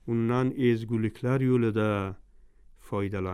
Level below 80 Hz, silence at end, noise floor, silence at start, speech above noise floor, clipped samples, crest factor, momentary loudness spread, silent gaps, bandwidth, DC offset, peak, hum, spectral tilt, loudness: -56 dBFS; 0 s; -54 dBFS; 0.05 s; 27 dB; under 0.1%; 14 dB; 8 LU; none; 13 kHz; under 0.1%; -14 dBFS; none; -8.5 dB/octave; -28 LUFS